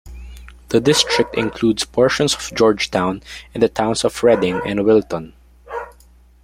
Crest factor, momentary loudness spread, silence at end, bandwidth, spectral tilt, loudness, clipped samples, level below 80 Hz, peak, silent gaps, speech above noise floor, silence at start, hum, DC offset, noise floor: 18 dB; 16 LU; 0.55 s; 16 kHz; -4 dB/octave; -17 LUFS; under 0.1%; -42 dBFS; 0 dBFS; none; 31 dB; 0.05 s; none; under 0.1%; -48 dBFS